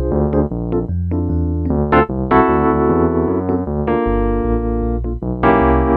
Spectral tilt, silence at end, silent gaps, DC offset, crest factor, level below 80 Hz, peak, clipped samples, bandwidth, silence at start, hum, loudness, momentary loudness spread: -11.5 dB/octave; 0 s; none; under 0.1%; 16 dB; -24 dBFS; 0 dBFS; under 0.1%; 4.5 kHz; 0 s; none; -17 LUFS; 7 LU